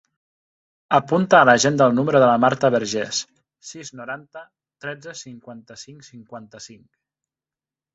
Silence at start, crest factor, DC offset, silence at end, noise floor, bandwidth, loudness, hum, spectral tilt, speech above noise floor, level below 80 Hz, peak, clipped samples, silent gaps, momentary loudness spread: 0.9 s; 20 dB; under 0.1%; 1.2 s; under -90 dBFS; 8 kHz; -17 LUFS; none; -4.5 dB/octave; over 70 dB; -64 dBFS; -2 dBFS; under 0.1%; none; 25 LU